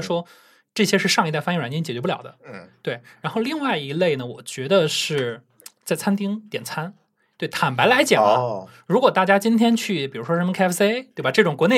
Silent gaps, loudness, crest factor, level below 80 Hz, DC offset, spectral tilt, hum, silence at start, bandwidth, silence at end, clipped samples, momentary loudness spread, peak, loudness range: none; -21 LUFS; 20 dB; -76 dBFS; under 0.1%; -4.5 dB/octave; none; 0 s; 16 kHz; 0 s; under 0.1%; 14 LU; -2 dBFS; 6 LU